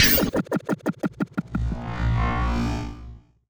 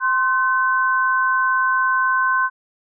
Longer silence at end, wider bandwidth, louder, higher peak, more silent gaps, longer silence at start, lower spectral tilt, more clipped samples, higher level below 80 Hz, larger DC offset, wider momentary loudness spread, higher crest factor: second, 0.3 s vs 0.5 s; first, over 20 kHz vs 1.7 kHz; second, -25 LUFS vs -18 LUFS; first, -4 dBFS vs -12 dBFS; neither; about the same, 0 s vs 0 s; first, -4.5 dB/octave vs 7.5 dB/octave; neither; first, -32 dBFS vs under -90 dBFS; neither; first, 10 LU vs 1 LU; first, 20 dB vs 6 dB